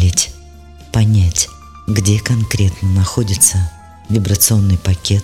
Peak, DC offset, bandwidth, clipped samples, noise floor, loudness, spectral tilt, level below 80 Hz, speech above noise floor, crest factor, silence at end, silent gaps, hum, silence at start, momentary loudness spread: 0 dBFS; 0.4%; 16.5 kHz; under 0.1%; -37 dBFS; -14 LUFS; -4 dB/octave; -30 dBFS; 24 dB; 14 dB; 0 s; none; none; 0 s; 9 LU